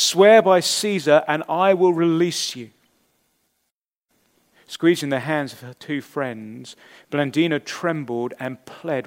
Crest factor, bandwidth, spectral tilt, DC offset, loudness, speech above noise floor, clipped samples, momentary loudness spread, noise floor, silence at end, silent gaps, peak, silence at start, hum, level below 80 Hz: 20 dB; 16 kHz; -4 dB/octave; under 0.1%; -20 LUFS; 58 dB; under 0.1%; 19 LU; -78 dBFS; 0 s; 3.72-3.79 s; 0 dBFS; 0 s; none; -76 dBFS